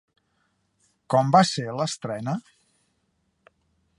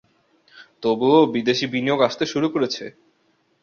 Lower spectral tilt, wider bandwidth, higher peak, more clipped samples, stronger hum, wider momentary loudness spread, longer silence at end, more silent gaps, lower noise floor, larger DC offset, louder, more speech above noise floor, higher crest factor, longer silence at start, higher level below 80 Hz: about the same, -5 dB/octave vs -5 dB/octave; first, 11.5 kHz vs 7 kHz; about the same, -4 dBFS vs -4 dBFS; neither; neither; about the same, 12 LU vs 10 LU; first, 1.6 s vs 0.75 s; neither; first, -72 dBFS vs -65 dBFS; neither; second, -23 LUFS vs -20 LUFS; first, 49 dB vs 45 dB; first, 24 dB vs 18 dB; first, 1.1 s vs 0.55 s; about the same, -68 dBFS vs -64 dBFS